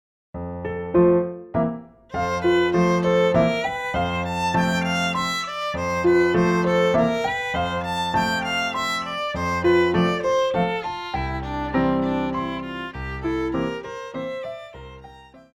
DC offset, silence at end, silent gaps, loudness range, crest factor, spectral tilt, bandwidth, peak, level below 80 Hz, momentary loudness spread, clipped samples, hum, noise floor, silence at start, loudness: under 0.1%; 0.15 s; none; 5 LU; 14 dB; -6 dB/octave; 14 kHz; -8 dBFS; -42 dBFS; 13 LU; under 0.1%; none; -45 dBFS; 0.35 s; -22 LUFS